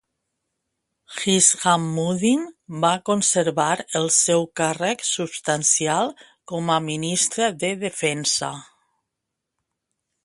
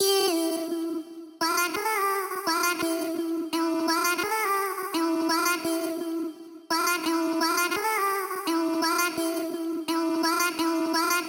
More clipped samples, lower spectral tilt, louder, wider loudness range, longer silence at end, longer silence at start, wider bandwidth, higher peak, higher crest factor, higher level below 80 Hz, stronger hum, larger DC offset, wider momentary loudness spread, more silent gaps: neither; first, -3 dB/octave vs -1.5 dB/octave; first, -20 LUFS vs -26 LUFS; first, 4 LU vs 1 LU; first, 1.6 s vs 0 s; first, 1.1 s vs 0 s; second, 11.5 kHz vs 17 kHz; first, -2 dBFS vs -10 dBFS; about the same, 20 dB vs 18 dB; first, -66 dBFS vs -76 dBFS; neither; neither; first, 9 LU vs 6 LU; neither